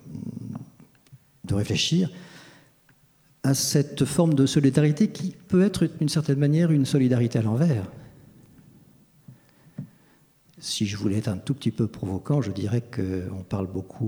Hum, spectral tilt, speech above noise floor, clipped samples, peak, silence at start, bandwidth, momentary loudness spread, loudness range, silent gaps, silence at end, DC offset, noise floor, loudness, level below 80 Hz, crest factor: none; -6 dB/octave; 37 dB; under 0.1%; -6 dBFS; 0.05 s; 19.5 kHz; 17 LU; 10 LU; none; 0 s; under 0.1%; -60 dBFS; -24 LUFS; -58 dBFS; 18 dB